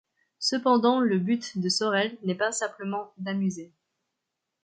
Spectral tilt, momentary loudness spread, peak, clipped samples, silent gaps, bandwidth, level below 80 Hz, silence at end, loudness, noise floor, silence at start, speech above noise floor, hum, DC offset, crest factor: -4.5 dB/octave; 11 LU; -8 dBFS; under 0.1%; none; 9.4 kHz; -76 dBFS; 1 s; -26 LUFS; -84 dBFS; 0.4 s; 57 dB; none; under 0.1%; 18 dB